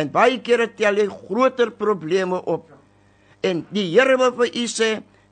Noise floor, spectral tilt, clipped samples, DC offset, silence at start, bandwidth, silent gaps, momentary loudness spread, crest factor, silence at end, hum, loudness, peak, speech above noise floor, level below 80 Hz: -55 dBFS; -4 dB/octave; under 0.1%; under 0.1%; 0 s; 9.4 kHz; none; 8 LU; 18 dB; 0.35 s; 50 Hz at -55 dBFS; -20 LUFS; -2 dBFS; 35 dB; -66 dBFS